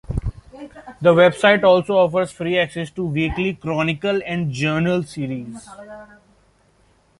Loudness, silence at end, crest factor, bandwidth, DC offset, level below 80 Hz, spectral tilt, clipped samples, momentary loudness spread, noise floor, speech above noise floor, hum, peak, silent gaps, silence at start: -19 LUFS; 1.15 s; 18 dB; 11.5 kHz; under 0.1%; -40 dBFS; -6.5 dB/octave; under 0.1%; 25 LU; -58 dBFS; 39 dB; none; -2 dBFS; none; 0.1 s